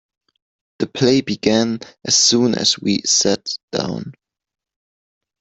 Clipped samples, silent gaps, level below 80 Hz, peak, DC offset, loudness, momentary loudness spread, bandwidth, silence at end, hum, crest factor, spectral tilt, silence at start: under 0.1%; 3.63-3.68 s; -58 dBFS; 0 dBFS; under 0.1%; -17 LUFS; 13 LU; 8.4 kHz; 1.3 s; none; 20 dB; -3 dB/octave; 0.8 s